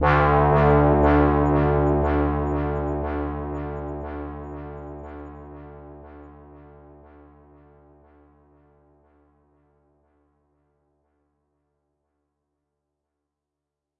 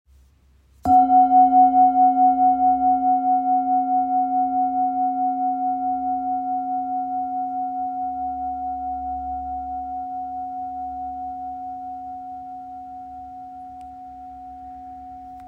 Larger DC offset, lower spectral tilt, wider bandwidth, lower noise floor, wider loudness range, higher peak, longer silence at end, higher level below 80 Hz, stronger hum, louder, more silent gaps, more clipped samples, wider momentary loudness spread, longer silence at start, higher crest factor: neither; about the same, -10 dB/octave vs -9 dB/octave; first, 5.2 kHz vs 2.3 kHz; first, -85 dBFS vs -56 dBFS; first, 25 LU vs 18 LU; about the same, -4 dBFS vs -6 dBFS; first, 7.4 s vs 0 s; first, -34 dBFS vs -52 dBFS; neither; about the same, -21 LUFS vs -21 LUFS; neither; neither; about the same, 25 LU vs 23 LU; second, 0 s vs 0.85 s; about the same, 20 dB vs 16 dB